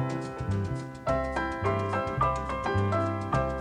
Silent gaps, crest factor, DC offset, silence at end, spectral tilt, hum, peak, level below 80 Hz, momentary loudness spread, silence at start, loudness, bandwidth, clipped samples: none; 16 dB; under 0.1%; 0 s; -7 dB/octave; none; -14 dBFS; -42 dBFS; 5 LU; 0 s; -30 LUFS; 10 kHz; under 0.1%